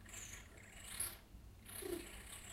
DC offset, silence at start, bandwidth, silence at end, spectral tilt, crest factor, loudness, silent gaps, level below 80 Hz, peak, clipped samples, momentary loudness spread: under 0.1%; 0 s; 16 kHz; 0 s; -2.5 dB/octave; 22 dB; -49 LUFS; none; -60 dBFS; -28 dBFS; under 0.1%; 13 LU